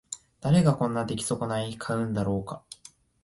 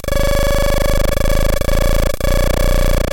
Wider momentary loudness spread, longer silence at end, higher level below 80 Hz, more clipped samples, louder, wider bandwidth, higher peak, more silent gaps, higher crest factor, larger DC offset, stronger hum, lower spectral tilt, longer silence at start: first, 19 LU vs 2 LU; first, 0.5 s vs 0 s; second, -54 dBFS vs -14 dBFS; neither; second, -27 LUFS vs -17 LUFS; second, 11.5 kHz vs 17.5 kHz; second, -10 dBFS vs -2 dBFS; neither; first, 18 dB vs 10 dB; neither; neither; first, -6 dB/octave vs -4.5 dB/octave; about the same, 0.1 s vs 0.05 s